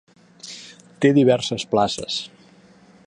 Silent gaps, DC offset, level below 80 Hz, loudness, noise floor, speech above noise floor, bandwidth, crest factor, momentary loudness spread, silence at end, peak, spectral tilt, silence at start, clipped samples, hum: none; under 0.1%; -60 dBFS; -20 LUFS; -51 dBFS; 32 dB; 11 kHz; 18 dB; 22 LU; 0.8 s; -4 dBFS; -5.5 dB/octave; 0.45 s; under 0.1%; none